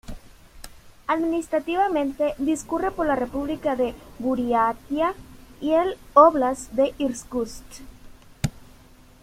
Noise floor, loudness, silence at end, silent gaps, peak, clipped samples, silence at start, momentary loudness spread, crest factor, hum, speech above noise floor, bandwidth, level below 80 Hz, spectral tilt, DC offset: -50 dBFS; -23 LUFS; 0.6 s; none; -2 dBFS; under 0.1%; 0.1 s; 12 LU; 22 dB; none; 27 dB; 16 kHz; -46 dBFS; -5.5 dB/octave; under 0.1%